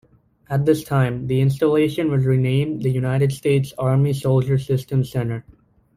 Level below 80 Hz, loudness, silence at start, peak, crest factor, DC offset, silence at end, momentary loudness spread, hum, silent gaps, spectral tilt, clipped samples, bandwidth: -50 dBFS; -20 LUFS; 0.5 s; -4 dBFS; 14 dB; under 0.1%; 0.45 s; 4 LU; none; none; -8 dB/octave; under 0.1%; 15 kHz